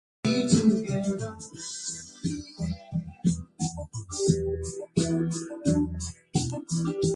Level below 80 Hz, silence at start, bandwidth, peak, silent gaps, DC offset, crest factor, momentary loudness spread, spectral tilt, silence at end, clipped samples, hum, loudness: -46 dBFS; 0.25 s; 11.5 kHz; -8 dBFS; none; under 0.1%; 20 dB; 11 LU; -5.5 dB/octave; 0 s; under 0.1%; none; -29 LUFS